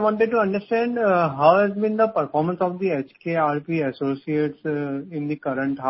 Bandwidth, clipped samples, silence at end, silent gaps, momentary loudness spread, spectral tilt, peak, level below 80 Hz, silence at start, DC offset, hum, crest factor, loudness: 5.8 kHz; under 0.1%; 0 s; none; 10 LU; -11.5 dB/octave; -2 dBFS; -64 dBFS; 0 s; under 0.1%; none; 20 dB; -22 LUFS